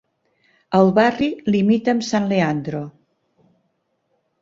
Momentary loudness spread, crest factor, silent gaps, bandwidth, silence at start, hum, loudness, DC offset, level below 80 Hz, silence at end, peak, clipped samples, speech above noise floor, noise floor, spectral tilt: 12 LU; 18 dB; none; 7.6 kHz; 0.7 s; none; -19 LUFS; under 0.1%; -58 dBFS; 1.5 s; -2 dBFS; under 0.1%; 52 dB; -70 dBFS; -6.5 dB/octave